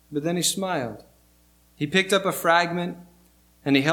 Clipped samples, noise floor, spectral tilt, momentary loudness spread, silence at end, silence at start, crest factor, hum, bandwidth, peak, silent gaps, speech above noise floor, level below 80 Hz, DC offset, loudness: under 0.1%; -59 dBFS; -3.5 dB/octave; 13 LU; 0 s; 0.1 s; 20 dB; 60 Hz at -55 dBFS; 19 kHz; -4 dBFS; none; 36 dB; -62 dBFS; under 0.1%; -23 LUFS